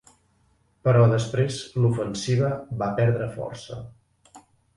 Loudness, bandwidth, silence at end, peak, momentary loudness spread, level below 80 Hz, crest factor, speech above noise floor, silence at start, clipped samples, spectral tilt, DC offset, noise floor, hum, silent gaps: -24 LUFS; 11.5 kHz; 0.4 s; -6 dBFS; 16 LU; -54 dBFS; 18 dB; 42 dB; 0.85 s; under 0.1%; -6.5 dB/octave; under 0.1%; -64 dBFS; none; none